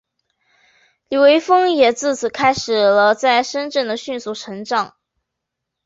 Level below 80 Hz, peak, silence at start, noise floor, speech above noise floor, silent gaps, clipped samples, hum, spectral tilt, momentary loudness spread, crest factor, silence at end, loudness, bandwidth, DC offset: -60 dBFS; -2 dBFS; 1.1 s; -80 dBFS; 64 dB; none; under 0.1%; none; -3 dB/octave; 13 LU; 16 dB; 1 s; -16 LUFS; 8 kHz; under 0.1%